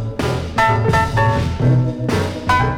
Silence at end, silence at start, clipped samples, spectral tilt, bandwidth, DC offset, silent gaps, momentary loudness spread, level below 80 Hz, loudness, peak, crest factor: 0 s; 0 s; under 0.1%; -6.5 dB/octave; 14.5 kHz; under 0.1%; none; 5 LU; -30 dBFS; -17 LUFS; -4 dBFS; 12 dB